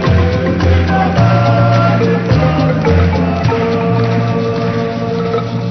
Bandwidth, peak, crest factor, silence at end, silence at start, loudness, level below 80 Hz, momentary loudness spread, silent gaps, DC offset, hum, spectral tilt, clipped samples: 6.4 kHz; 0 dBFS; 12 dB; 0 s; 0 s; -13 LUFS; -28 dBFS; 6 LU; none; under 0.1%; none; -8 dB/octave; under 0.1%